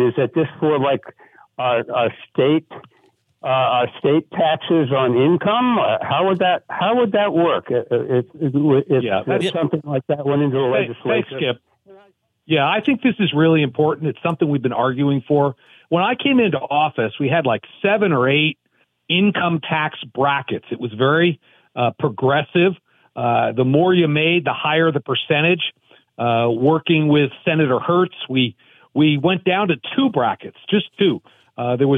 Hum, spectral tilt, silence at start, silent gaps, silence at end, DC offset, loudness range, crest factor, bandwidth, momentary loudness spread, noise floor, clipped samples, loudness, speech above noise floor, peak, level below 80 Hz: none; -8 dB/octave; 0 s; none; 0 s; under 0.1%; 3 LU; 14 dB; 10 kHz; 7 LU; -59 dBFS; under 0.1%; -18 LUFS; 41 dB; -4 dBFS; -68 dBFS